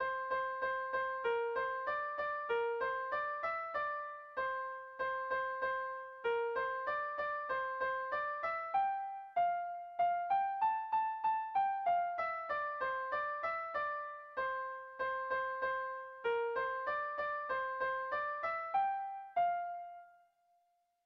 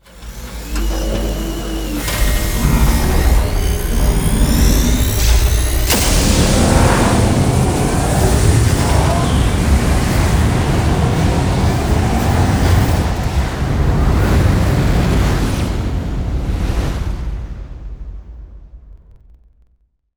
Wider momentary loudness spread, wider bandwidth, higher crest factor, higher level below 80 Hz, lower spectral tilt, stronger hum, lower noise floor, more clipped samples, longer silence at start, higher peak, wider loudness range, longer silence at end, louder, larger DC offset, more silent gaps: second, 6 LU vs 10 LU; second, 6.2 kHz vs over 20 kHz; about the same, 14 dB vs 14 dB; second, -74 dBFS vs -18 dBFS; about the same, -4.5 dB/octave vs -5 dB/octave; neither; first, -77 dBFS vs -58 dBFS; neither; second, 0 s vs 0.15 s; second, -24 dBFS vs 0 dBFS; second, 3 LU vs 8 LU; second, 0.95 s vs 1.2 s; second, -37 LUFS vs -15 LUFS; neither; neither